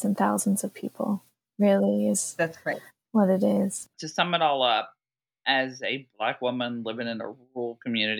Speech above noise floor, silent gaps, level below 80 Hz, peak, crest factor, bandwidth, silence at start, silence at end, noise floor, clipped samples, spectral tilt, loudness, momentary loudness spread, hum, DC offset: 46 dB; none; -82 dBFS; -8 dBFS; 20 dB; 18 kHz; 0 s; 0 s; -72 dBFS; under 0.1%; -4 dB/octave; -27 LUFS; 12 LU; none; under 0.1%